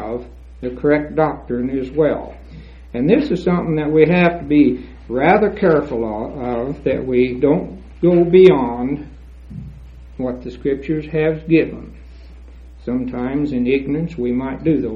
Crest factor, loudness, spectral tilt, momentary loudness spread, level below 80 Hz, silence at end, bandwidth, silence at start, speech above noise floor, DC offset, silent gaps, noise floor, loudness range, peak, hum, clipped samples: 18 dB; -17 LUFS; -9.5 dB/octave; 16 LU; -38 dBFS; 0 s; 6.8 kHz; 0 s; 22 dB; under 0.1%; none; -38 dBFS; 6 LU; 0 dBFS; none; under 0.1%